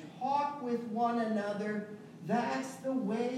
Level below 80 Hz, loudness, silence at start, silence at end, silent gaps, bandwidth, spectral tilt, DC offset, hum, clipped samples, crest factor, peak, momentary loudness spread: -84 dBFS; -34 LUFS; 0 s; 0 s; none; 13.5 kHz; -6 dB/octave; under 0.1%; none; under 0.1%; 14 dB; -20 dBFS; 6 LU